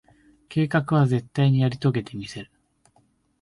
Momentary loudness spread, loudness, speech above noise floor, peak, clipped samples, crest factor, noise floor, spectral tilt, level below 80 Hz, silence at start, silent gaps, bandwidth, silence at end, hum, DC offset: 15 LU; -23 LUFS; 42 dB; -8 dBFS; under 0.1%; 16 dB; -64 dBFS; -8 dB/octave; -58 dBFS; 0.5 s; none; 11 kHz; 1 s; none; under 0.1%